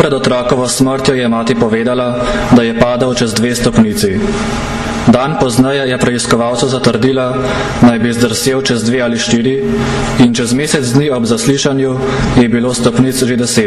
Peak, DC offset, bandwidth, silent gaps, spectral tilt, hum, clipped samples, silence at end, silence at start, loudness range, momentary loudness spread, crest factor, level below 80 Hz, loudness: 0 dBFS; under 0.1%; 14 kHz; none; -5 dB/octave; none; under 0.1%; 0 s; 0 s; 1 LU; 4 LU; 12 dB; -30 dBFS; -12 LUFS